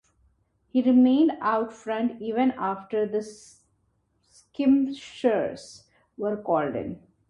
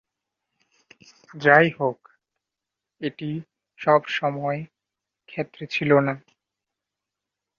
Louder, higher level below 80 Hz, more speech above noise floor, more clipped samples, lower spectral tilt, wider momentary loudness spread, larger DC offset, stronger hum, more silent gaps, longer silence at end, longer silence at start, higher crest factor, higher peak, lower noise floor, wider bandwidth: second, -25 LUFS vs -22 LUFS; about the same, -64 dBFS vs -68 dBFS; second, 46 dB vs 64 dB; neither; about the same, -6.5 dB/octave vs -7 dB/octave; second, 14 LU vs 18 LU; neither; neither; neither; second, 0.35 s vs 1.4 s; second, 0.75 s vs 1.35 s; second, 16 dB vs 24 dB; second, -10 dBFS vs -2 dBFS; second, -70 dBFS vs -86 dBFS; first, 10.5 kHz vs 7.2 kHz